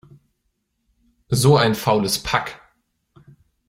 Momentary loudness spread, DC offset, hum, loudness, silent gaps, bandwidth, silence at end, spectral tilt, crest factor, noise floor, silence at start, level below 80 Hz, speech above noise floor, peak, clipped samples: 9 LU; under 0.1%; none; -18 LUFS; none; 16.5 kHz; 1.1 s; -5 dB/octave; 20 dB; -72 dBFS; 1.3 s; -48 dBFS; 54 dB; -2 dBFS; under 0.1%